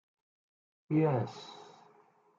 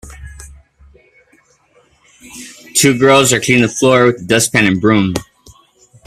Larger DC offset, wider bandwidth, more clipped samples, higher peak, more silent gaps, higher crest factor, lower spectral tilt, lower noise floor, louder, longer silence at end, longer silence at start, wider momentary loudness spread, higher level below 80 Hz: neither; second, 7.4 kHz vs 16 kHz; neither; second, -18 dBFS vs 0 dBFS; neither; about the same, 18 dB vs 16 dB; first, -8.5 dB/octave vs -4 dB/octave; first, -65 dBFS vs -53 dBFS; second, -32 LUFS vs -11 LUFS; about the same, 0.75 s vs 0.85 s; first, 0.9 s vs 0.05 s; about the same, 21 LU vs 23 LU; second, -80 dBFS vs -44 dBFS